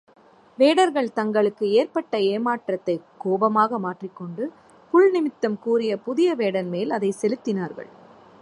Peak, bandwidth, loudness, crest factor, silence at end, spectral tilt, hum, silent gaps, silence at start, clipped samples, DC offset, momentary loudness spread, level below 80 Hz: -6 dBFS; 11.5 kHz; -22 LUFS; 16 dB; 0.55 s; -6 dB/octave; none; none; 0.6 s; under 0.1%; under 0.1%; 13 LU; -76 dBFS